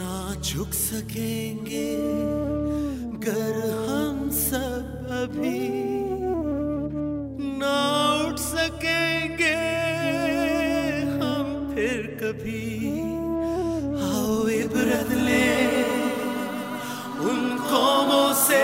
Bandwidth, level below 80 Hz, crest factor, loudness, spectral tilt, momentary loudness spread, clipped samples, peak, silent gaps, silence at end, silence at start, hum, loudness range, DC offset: 16 kHz; -44 dBFS; 18 dB; -25 LUFS; -4 dB/octave; 9 LU; under 0.1%; -8 dBFS; none; 0 s; 0 s; none; 4 LU; under 0.1%